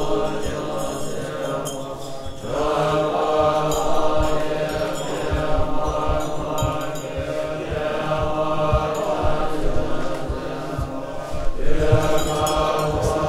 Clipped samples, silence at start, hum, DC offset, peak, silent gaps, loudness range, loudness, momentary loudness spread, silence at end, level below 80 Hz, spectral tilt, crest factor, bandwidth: under 0.1%; 0 s; none; under 0.1%; -2 dBFS; none; 3 LU; -23 LUFS; 9 LU; 0 s; -30 dBFS; -5.5 dB/octave; 18 dB; 14.5 kHz